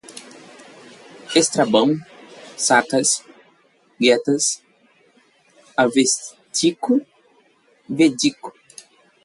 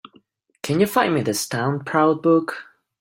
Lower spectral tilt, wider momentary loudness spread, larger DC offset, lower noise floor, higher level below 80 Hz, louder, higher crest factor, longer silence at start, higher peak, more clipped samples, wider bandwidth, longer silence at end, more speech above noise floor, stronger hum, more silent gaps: second, -3 dB/octave vs -5 dB/octave; first, 17 LU vs 12 LU; neither; about the same, -58 dBFS vs -57 dBFS; second, -68 dBFS vs -62 dBFS; about the same, -19 LUFS vs -20 LUFS; about the same, 20 dB vs 18 dB; second, 0.1 s vs 0.65 s; about the same, -2 dBFS vs -2 dBFS; neither; second, 11.5 kHz vs 16.5 kHz; first, 0.75 s vs 0.4 s; about the same, 40 dB vs 38 dB; neither; neither